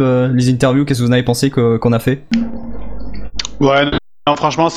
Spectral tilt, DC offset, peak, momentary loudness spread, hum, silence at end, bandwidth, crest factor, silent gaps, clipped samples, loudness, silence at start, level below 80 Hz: -6 dB/octave; under 0.1%; 0 dBFS; 15 LU; none; 0 s; 15 kHz; 14 dB; none; under 0.1%; -15 LUFS; 0 s; -34 dBFS